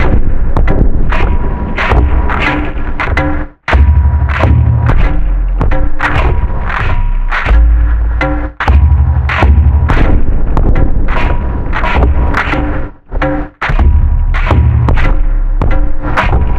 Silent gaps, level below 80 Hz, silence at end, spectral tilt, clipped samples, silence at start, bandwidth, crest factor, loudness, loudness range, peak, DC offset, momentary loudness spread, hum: none; -10 dBFS; 0 s; -8 dB/octave; 0.5%; 0 s; 6 kHz; 8 dB; -12 LUFS; 3 LU; 0 dBFS; under 0.1%; 7 LU; none